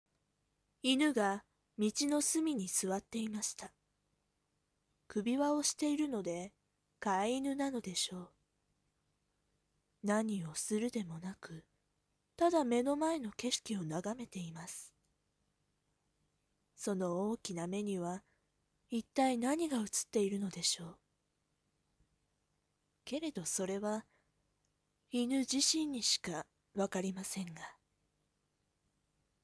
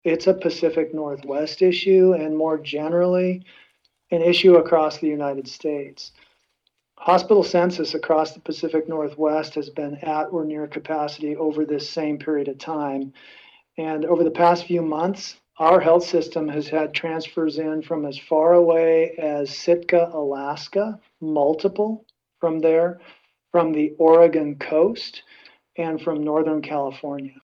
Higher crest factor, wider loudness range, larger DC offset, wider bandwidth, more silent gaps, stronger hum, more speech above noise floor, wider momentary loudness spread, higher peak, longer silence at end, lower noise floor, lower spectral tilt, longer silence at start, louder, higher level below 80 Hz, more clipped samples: about the same, 22 dB vs 18 dB; about the same, 7 LU vs 6 LU; neither; first, 11 kHz vs 7.2 kHz; neither; first, 50 Hz at -70 dBFS vs none; second, 46 dB vs 51 dB; about the same, 14 LU vs 13 LU; second, -18 dBFS vs -2 dBFS; first, 1.7 s vs 0.15 s; first, -82 dBFS vs -72 dBFS; second, -3.5 dB/octave vs -6 dB/octave; first, 0.85 s vs 0.05 s; second, -36 LUFS vs -21 LUFS; second, -76 dBFS vs -70 dBFS; neither